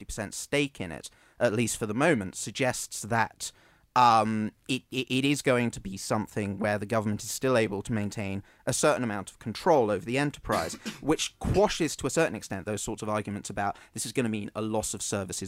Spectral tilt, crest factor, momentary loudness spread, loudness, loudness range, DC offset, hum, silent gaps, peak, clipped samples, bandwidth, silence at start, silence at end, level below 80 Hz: -4.5 dB/octave; 20 dB; 10 LU; -29 LUFS; 3 LU; under 0.1%; none; none; -8 dBFS; under 0.1%; 16 kHz; 0 s; 0 s; -52 dBFS